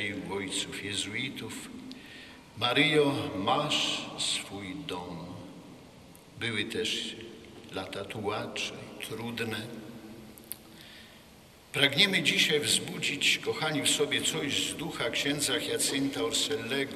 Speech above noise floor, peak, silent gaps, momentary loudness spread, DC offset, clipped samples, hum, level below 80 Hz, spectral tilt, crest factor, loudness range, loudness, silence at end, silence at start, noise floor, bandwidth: 24 dB; -6 dBFS; none; 21 LU; under 0.1%; under 0.1%; none; -66 dBFS; -2.5 dB/octave; 24 dB; 11 LU; -29 LUFS; 0 s; 0 s; -54 dBFS; 14 kHz